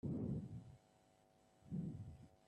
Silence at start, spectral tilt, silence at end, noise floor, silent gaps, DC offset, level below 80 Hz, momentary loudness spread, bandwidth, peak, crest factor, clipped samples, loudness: 0.05 s; -10 dB/octave; 0.15 s; -73 dBFS; none; under 0.1%; -68 dBFS; 17 LU; 10.5 kHz; -34 dBFS; 16 dB; under 0.1%; -49 LUFS